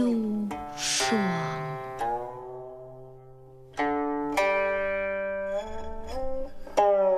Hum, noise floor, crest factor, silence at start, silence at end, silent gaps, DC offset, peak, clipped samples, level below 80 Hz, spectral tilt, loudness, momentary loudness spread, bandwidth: none; -48 dBFS; 20 dB; 0 s; 0 s; none; under 0.1%; -8 dBFS; under 0.1%; -46 dBFS; -4 dB/octave; -28 LUFS; 16 LU; 15 kHz